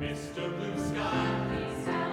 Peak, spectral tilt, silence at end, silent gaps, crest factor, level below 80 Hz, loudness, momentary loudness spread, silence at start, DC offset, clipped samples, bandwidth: -18 dBFS; -6 dB/octave; 0 s; none; 14 dB; -50 dBFS; -32 LUFS; 6 LU; 0 s; under 0.1%; under 0.1%; 15.5 kHz